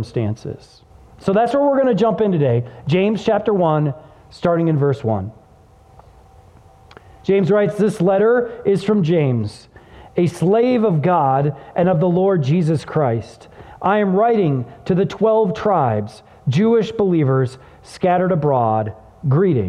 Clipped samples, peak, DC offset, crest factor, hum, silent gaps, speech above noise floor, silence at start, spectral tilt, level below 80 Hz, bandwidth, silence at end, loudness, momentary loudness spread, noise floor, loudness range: under 0.1%; -4 dBFS; under 0.1%; 14 dB; none; none; 31 dB; 0 s; -8.5 dB/octave; -52 dBFS; 11 kHz; 0 s; -17 LUFS; 9 LU; -48 dBFS; 4 LU